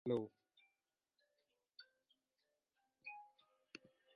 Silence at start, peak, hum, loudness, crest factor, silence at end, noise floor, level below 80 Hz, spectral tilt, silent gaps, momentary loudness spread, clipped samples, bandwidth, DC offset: 0.05 s; -26 dBFS; none; -50 LUFS; 26 dB; 0.4 s; under -90 dBFS; -90 dBFS; -5.5 dB/octave; none; 23 LU; under 0.1%; 5.6 kHz; under 0.1%